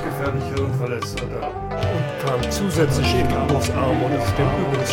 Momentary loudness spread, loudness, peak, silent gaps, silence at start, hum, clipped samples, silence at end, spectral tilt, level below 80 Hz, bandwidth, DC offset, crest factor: 7 LU; -22 LUFS; -4 dBFS; none; 0 s; none; under 0.1%; 0 s; -6 dB/octave; -34 dBFS; 17.5 kHz; under 0.1%; 16 dB